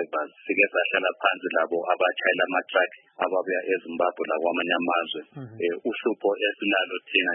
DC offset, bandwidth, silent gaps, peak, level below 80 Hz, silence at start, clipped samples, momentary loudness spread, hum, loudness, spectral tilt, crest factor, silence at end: under 0.1%; 3.8 kHz; none; -6 dBFS; -82 dBFS; 0 s; under 0.1%; 7 LU; none; -25 LUFS; -8 dB/octave; 20 dB; 0 s